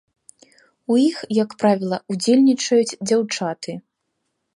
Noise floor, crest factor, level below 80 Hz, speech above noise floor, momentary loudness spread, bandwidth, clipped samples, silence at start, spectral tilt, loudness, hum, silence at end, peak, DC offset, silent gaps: -75 dBFS; 16 dB; -70 dBFS; 56 dB; 15 LU; 11.5 kHz; under 0.1%; 0.9 s; -5 dB/octave; -19 LUFS; none; 0.75 s; -4 dBFS; under 0.1%; none